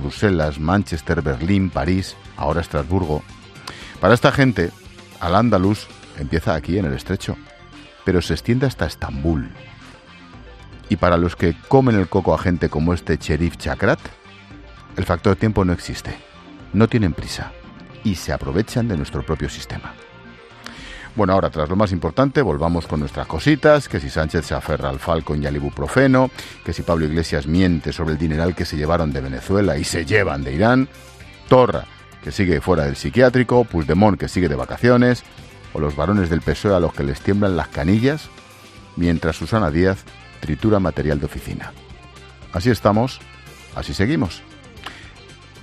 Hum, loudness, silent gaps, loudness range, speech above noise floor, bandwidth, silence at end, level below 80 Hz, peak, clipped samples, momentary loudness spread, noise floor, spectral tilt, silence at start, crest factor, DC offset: none; -19 LUFS; none; 5 LU; 24 dB; 14 kHz; 0 s; -36 dBFS; 0 dBFS; under 0.1%; 17 LU; -42 dBFS; -7 dB/octave; 0 s; 20 dB; under 0.1%